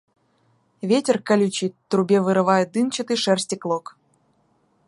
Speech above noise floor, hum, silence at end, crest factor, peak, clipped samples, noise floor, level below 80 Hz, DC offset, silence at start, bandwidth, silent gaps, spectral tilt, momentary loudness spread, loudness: 44 dB; none; 1.1 s; 18 dB; -4 dBFS; under 0.1%; -64 dBFS; -72 dBFS; under 0.1%; 0.85 s; 11.5 kHz; none; -5 dB/octave; 8 LU; -21 LUFS